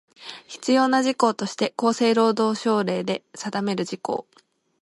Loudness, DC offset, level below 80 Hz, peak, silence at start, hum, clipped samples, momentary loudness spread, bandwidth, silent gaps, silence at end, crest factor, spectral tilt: -23 LUFS; under 0.1%; -72 dBFS; -4 dBFS; 0.2 s; none; under 0.1%; 12 LU; 11.5 kHz; none; 0.6 s; 20 dB; -4.5 dB/octave